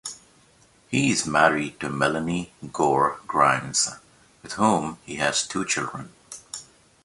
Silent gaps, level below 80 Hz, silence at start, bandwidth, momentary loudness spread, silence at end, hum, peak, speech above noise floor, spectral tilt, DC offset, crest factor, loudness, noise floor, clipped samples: none; -58 dBFS; 0.05 s; 11.5 kHz; 17 LU; 0.4 s; none; -2 dBFS; 34 dB; -3.5 dB/octave; under 0.1%; 22 dB; -23 LUFS; -57 dBFS; under 0.1%